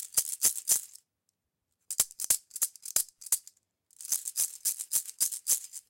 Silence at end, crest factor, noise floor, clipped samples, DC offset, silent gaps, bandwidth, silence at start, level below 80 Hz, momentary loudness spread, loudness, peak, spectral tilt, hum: 0.1 s; 24 dB; -84 dBFS; under 0.1%; under 0.1%; none; 17 kHz; 0 s; -72 dBFS; 5 LU; -29 LUFS; -10 dBFS; 2.5 dB/octave; none